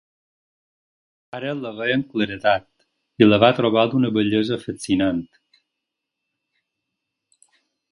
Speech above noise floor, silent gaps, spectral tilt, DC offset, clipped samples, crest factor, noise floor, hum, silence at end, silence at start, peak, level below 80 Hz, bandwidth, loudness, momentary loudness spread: 62 dB; none; -6 dB/octave; under 0.1%; under 0.1%; 22 dB; -82 dBFS; none; 2.65 s; 1.35 s; 0 dBFS; -56 dBFS; 11 kHz; -20 LUFS; 13 LU